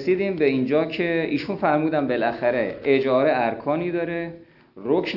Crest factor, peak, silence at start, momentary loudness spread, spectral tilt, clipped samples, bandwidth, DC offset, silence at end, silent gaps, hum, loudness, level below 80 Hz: 16 dB; -6 dBFS; 0 s; 6 LU; -8 dB/octave; under 0.1%; 6 kHz; under 0.1%; 0 s; none; none; -22 LUFS; -60 dBFS